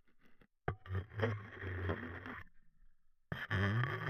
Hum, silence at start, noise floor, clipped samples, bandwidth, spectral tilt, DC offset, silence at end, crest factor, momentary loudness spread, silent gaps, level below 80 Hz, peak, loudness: none; 0.1 s; -64 dBFS; under 0.1%; 13 kHz; -7.5 dB/octave; under 0.1%; 0 s; 22 dB; 12 LU; none; -62 dBFS; -20 dBFS; -41 LUFS